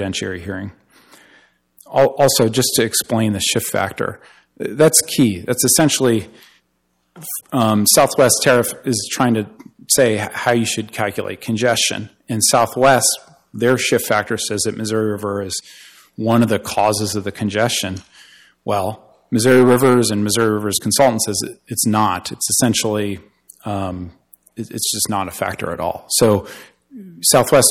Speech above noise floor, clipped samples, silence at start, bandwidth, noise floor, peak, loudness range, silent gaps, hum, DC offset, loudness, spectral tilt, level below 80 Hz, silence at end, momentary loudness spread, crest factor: 49 dB; under 0.1%; 0 s; 17 kHz; -66 dBFS; 0 dBFS; 5 LU; none; none; under 0.1%; -16 LUFS; -3.5 dB/octave; -52 dBFS; 0 s; 14 LU; 18 dB